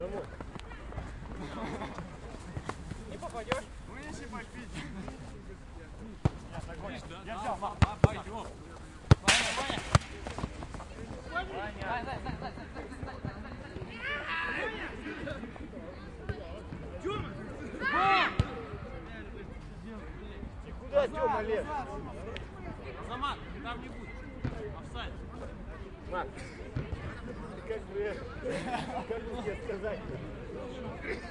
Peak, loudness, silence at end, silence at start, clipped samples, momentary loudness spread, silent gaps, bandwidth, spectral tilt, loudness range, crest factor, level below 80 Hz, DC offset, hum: -6 dBFS; -36 LUFS; 0 s; 0 s; under 0.1%; 15 LU; none; 11.5 kHz; -5 dB/octave; 11 LU; 30 dB; -46 dBFS; under 0.1%; none